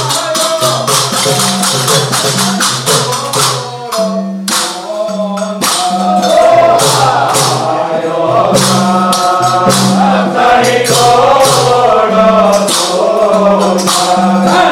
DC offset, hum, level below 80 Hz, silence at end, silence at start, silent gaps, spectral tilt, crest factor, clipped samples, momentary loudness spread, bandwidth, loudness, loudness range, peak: under 0.1%; none; -46 dBFS; 0 s; 0 s; none; -3.5 dB/octave; 10 dB; under 0.1%; 7 LU; 17 kHz; -9 LUFS; 4 LU; 0 dBFS